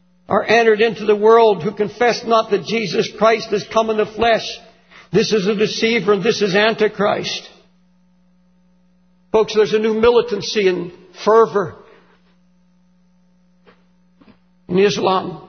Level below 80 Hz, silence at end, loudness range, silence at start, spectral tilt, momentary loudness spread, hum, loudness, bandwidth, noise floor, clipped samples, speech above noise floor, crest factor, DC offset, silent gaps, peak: -52 dBFS; 0.1 s; 6 LU; 0.3 s; -4.5 dB/octave; 8 LU; none; -16 LUFS; 6.6 kHz; -56 dBFS; under 0.1%; 41 dB; 18 dB; under 0.1%; none; 0 dBFS